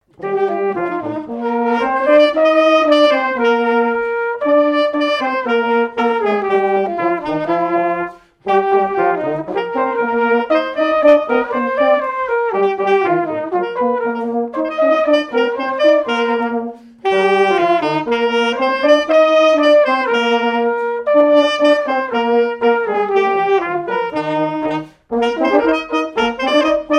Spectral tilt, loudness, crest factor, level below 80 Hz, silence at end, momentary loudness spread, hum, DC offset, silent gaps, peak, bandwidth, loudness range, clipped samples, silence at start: -5 dB/octave; -15 LUFS; 14 dB; -56 dBFS; 0 s; 8 LU; none; under 0.1%; none; 0 dBFS; 9.4 kHz; 4 LU; under 0.1%; 0.2 s